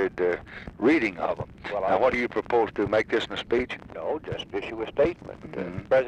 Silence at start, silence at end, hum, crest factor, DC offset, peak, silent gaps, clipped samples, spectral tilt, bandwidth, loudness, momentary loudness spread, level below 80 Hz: 0 s; 0 s; none; 16 dB; under 0.1%; -12 dBFS; none; under 0.1%; -6.5 dB/octave; 9.4 kHz; -27 LUFS; 11 LU; -52 dBFS